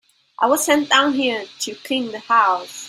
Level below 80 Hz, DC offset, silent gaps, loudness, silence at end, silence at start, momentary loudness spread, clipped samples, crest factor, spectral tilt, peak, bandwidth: -68 dBFS; under 0.1%; none; -18 LUFS; 0 s; 0.4 s; 10 LU; under 0.1%; 18 dB; -1 dB/octave; -2 dBFS; 16 kHz